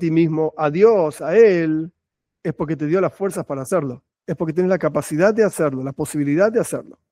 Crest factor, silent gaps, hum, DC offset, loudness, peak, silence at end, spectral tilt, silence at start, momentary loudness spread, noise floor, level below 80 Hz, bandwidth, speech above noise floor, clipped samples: 16 dB; none; none; under 0.1%; -19 LUFS; -2 dBFS; 0.2 s; -7 dB/octave; 0 s; 13 LU; -42 dBFS; -60 dBFS; 15.5 kHz; 24 dB; under 0.1%